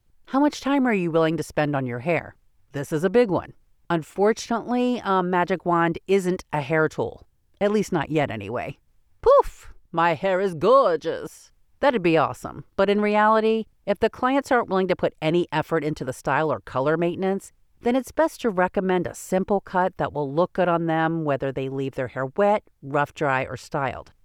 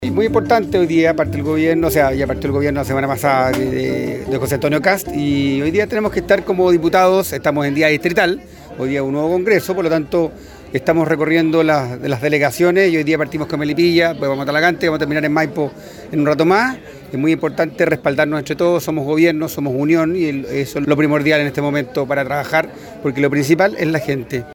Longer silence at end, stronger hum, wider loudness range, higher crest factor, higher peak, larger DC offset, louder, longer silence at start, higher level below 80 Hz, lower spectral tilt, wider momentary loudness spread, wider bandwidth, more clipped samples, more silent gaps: first, 0.2 s vs 0 s; neither; about the same, 3 LU vs 2 LU; about the same, 16 dB vs 16 dB; second, -6 dBFS vs 0 dBFS; neither; second, -23 LUFS vs -16 LUFS; first, 0.3 s vs 0 s; second, -52 dBFS vs -42 dBFS; about the same, -6.5 dB/octave vs -6 dB/octave; about the same, 9 LU vs 7 LU; about the same, 16 kHz vs 17.5 kHz; neither; neither